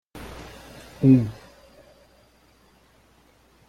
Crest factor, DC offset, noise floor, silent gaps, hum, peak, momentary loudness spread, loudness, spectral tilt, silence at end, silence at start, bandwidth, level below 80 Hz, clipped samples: 22 dB; under 0.1%; -58 dBFS; none; none; -6 dBFS; 26 LU; -20 LUFS; -9 dB/octave; 2.35 s; 0.15 s; 13 kHz; -52 dBFS; under 0.1%